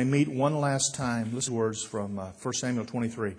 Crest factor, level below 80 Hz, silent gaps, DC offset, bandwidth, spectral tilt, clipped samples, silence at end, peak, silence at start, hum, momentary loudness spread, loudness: 16 dB; -64 dBFS; none; under 0.1%; 10.5 kHz; -4.5 dB/octave; under 0.1%; 0 s; -12 dBFS; 0 s; none; 8 LU; -29 LUFS